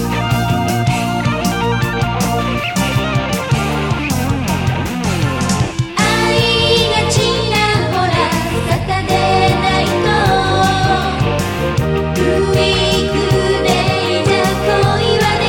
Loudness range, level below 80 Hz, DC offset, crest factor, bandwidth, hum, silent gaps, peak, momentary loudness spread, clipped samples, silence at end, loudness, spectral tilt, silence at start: 3 LU; -30 dBFS; under 0.1%; 14 dB; 18.5 kHz; none; none; 0 dBFS; 5 LU; under 0.1%; 0 s; -14 LUFS; -5 dB/octave; 0 s